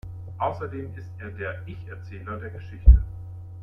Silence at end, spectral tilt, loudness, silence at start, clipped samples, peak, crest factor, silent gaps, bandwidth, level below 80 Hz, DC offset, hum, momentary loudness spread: 0 s; -9.5 dB/octave; -25 LUFS; 0.05 s; under 0.1%; -2 dBFS; 22 dB; none; 3.4 kHz; -24 dBFS; under 0.1%; none; 20 LU